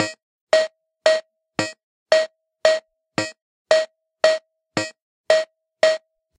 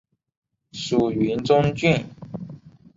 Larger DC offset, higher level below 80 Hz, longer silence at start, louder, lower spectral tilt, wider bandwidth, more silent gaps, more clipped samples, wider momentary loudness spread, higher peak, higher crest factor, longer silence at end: neither; second, -76 dBFS vs -52 dBFS; second, 0 s vs 0.75 s; about the same, -22 LUFS vs -21 LUFS; second, -2.5 dB/octave vs -6.5 dB/octave; first, 10.5 kHz vs 7.8 kHz; first, 0.23-0.47 s, 1.83-2.06 s, 3.42-3.65 s, 5.02-5.24 s vs none; neither; second, 10 LU vs 17 LU; about the same, -2 dBFS vs -4 dBFS; about the same, 22 dB vs 20 dB; about the same, 0.4 s vs 0.3 s